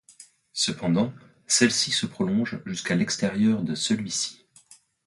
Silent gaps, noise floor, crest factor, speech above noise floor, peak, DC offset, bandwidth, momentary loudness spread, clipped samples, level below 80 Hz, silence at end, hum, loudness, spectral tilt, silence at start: none; -55 dBFS; 20 dB; 31 dB; -6 dBFS; under 0.1%; 11.5 kHz; 10 LU; under 0.1%; -62 dBFS; 0.7 s; none; -25 LUFS; -3.5 dB/octave; 0.2 s